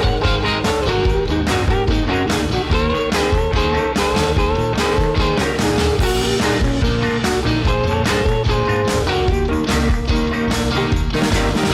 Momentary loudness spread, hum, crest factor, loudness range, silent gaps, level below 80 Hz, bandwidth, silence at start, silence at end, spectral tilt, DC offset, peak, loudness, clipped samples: 1 LU; none; 10 dB; 1 LU; none; -22 dBFS; 15.5 kHz; 0 s; 0 s; -5.5 dB/octave; under 0.1%; -8 dBFS; -18 LUFS; under 0.1%